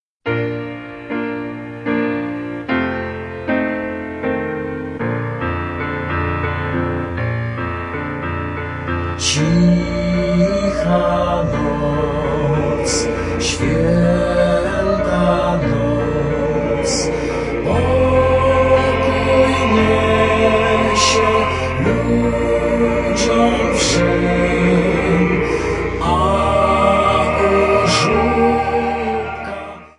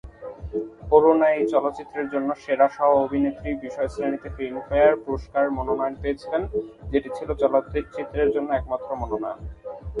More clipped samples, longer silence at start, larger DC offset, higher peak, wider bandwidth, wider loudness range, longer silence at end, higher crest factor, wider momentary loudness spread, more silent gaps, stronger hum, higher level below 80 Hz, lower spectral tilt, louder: neither; first, 0.25 s vs 0.05 s; neither; about the same, 0 dBFS vs -2 dBFS; first, 11.5 kHz vs 10 kHz; first, 7 LU vs 4 LU; about the same, 0.1 s vs 0 s; about the same, 16 dB vs 20 dB; second, 10 LU vs 13 LU; neither; neither; first, -32 dBFS vs -42 dBFS; second, -5.5 dB/octave vs -8 dB/octave; first, -17 LUFS vs -24 LUFS